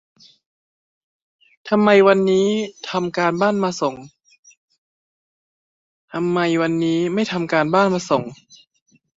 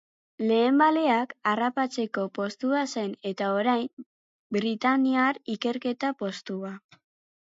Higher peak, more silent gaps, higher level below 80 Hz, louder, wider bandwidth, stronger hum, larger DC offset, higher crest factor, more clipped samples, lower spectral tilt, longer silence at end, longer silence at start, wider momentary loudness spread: first, -2 dBFS vs -8 dBFS; first, 4.39-4.43 s, 4.57-4.68 s, 4.78-6.08 s vs 3.93-3.97 s, 4.06-4.50 s; first, -64 dBFS vs -78 dBFS; first, -18 LUFS vs -26 LUFS; about the same, 7.8 kHz vs 7.8 kHz; neither; neither; about the same, 20 dB vs 18 dB; neither; about the same, -6 dB/octave vs -5 dB/octave; first, 0.85 s vs 0.6 s; first, 1.65 s vs 0.4 s; about the same, 11 LU vs 12 LU